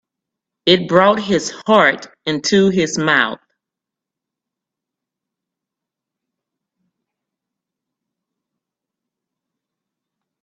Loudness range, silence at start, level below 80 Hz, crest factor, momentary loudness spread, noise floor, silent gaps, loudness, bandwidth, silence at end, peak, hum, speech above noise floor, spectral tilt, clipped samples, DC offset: 8 LU; 0.65 s; -60 dBFS; 20 dB; 9 LU; -85 dBFS; none; -15 LUFS; 8.4 kHz; 7.1 s; 0 dBFS; none; 70 dB; -4 dB/octave; under 0.1%; under 0.1%